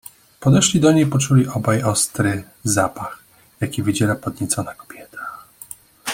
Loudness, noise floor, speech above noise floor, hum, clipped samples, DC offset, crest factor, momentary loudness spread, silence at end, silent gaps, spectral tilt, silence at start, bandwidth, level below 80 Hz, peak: -18 LUFS; -41 dBFS; 23 dB; none; under 0.1%; under 0.1%; 18 dB; 21 LU; 0 s; none; -5 dB/octave; 0.4 s; 17 kHz; -52 dBFS; -2 dBFS